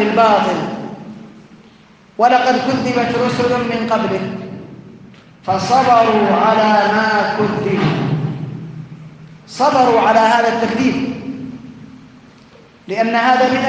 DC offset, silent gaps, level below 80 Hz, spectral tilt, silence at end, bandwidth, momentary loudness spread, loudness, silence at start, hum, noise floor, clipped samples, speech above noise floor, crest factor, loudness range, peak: under 0.1%; none; -54 dBFS; -6 dB/octave; 0 s; 9.4 kHz; 20 LU; -15 LUFS; 0 s; none; -45 dBFS; under 0.1%; 32 dB; 16 dB; 4 LU; 0 dBFS